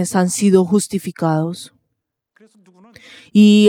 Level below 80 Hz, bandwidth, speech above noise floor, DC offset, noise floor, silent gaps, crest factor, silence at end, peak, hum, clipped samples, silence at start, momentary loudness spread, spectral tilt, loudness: -62 dBFS; 15.5 kHz; 61 dB; under 0.1%; -76 dBFS; none; 16 dB; 0 s; 0 dBFS; none; under 0.1%; 0 s; 14 LU; -5.5 dB/octave; -16 LUFS